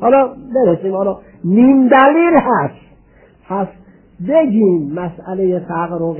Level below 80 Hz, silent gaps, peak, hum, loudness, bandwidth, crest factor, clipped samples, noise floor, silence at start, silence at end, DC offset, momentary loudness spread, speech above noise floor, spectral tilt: -50 dBFS; none; 0 dBFS; none; -14 LUFS; 3.2 kHz; 14 dB; under 0.1%; -47 dBFS; 0 s; 0 s; under 0.1%; 15 LU; 34 dB; -11.5 dB/octave